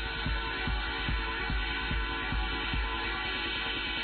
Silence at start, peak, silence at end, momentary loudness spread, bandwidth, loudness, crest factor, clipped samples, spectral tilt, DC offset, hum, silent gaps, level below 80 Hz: 0 s; -20 dBFS; 0 s; 1 LU; 4.6 kHz; -32 LUFS; 12 dB; under 0.1%; -7 dB/octave; under 0.1%; none; none; -36 dBFS